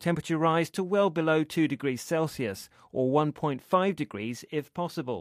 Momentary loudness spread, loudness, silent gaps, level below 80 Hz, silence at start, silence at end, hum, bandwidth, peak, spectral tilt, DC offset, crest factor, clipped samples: 9 LU; -28 LUFS; none; -66 dBFS; 0 s; 0 s; none; 15.5 kHz; -10 dBFS; -6 dB/octave; under 0.1%; 18 dB; under 0.1%